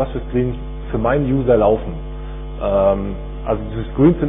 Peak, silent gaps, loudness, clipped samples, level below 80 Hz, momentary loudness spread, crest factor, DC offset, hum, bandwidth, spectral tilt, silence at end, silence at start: -2 dBFS; none; -19 LUFS; under 0.1%; -28 dBFS; 15 LU; 16 dB; under 0.1%; none; 3.8 kHz; -12.5 dB/octave; 0 s; 0 s